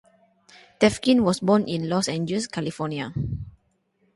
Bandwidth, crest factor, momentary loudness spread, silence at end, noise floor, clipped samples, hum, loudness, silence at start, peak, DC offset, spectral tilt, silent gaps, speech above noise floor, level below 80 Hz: 11.5 kHz; 20 dB; 10 LU; 0.65 s; -68 dBFS; under 0.1%; none; -24 LUFS; 0.8 s; -4 dBFS; under 0.1%; -5.5 dB/octave; none; 46 dB; -50 dBFS